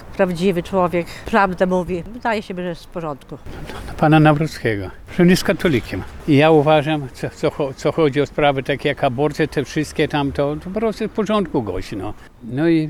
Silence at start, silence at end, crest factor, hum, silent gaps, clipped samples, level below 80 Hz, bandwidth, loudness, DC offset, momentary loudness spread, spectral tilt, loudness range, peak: 0 s; 0 s; 16 dB; none; none; under 0.1%; -40 dBFS; 15.5 kHz; -19 LUFS; under 0.1%; 15 LU; -6.5 dB/octave; 5 LU; -2 dBFS